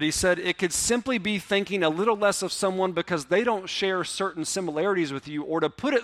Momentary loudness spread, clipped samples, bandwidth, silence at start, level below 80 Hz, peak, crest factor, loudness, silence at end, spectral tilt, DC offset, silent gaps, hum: 5 LU; under 0.1%; 15.5 kHz; 0 s; -54 dBFS; -8 dBFS; 16 dB; -25 LUFS; 0 s; -3.5 dB/octave; under 0.1%; none; none